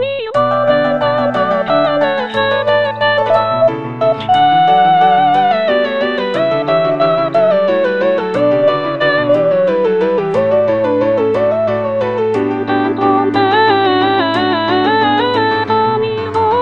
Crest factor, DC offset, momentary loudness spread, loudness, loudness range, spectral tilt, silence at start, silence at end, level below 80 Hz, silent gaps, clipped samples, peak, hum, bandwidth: 12 dB; 0.5%; 5 LU; -13 LUFS; 2 LU; -7 dB/octave; 0 s; 0 s; -50 dBFS; none; under 0.1%; 0 dBFS; none; 7.4 kHz